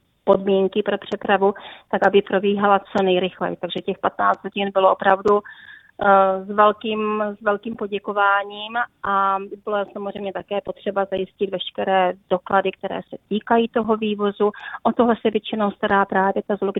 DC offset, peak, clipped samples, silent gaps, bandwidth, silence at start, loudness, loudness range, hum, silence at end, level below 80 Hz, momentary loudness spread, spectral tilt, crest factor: under 0.1%; 0 dBFS; under 0.1%; none; 6.8 kHz; 0.25 s; -21 LUFS; 4 LU; none; 0 s; -60 dBFS; 10 LU; -7.5 dB/octave; 20 dB